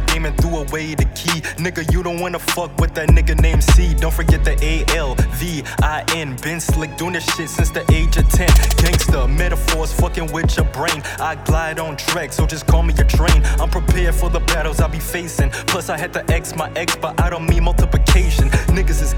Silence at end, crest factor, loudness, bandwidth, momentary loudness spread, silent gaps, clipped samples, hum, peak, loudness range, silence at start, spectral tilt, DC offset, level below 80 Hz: 0 s; 14 dB; -18 LUFS; 19 kHz; 7 LU; none; under 0.1%; none; -2 dBFS; 3 LU; 0 s; -4.5 dB/octave; under 0.1%; -18 dBFS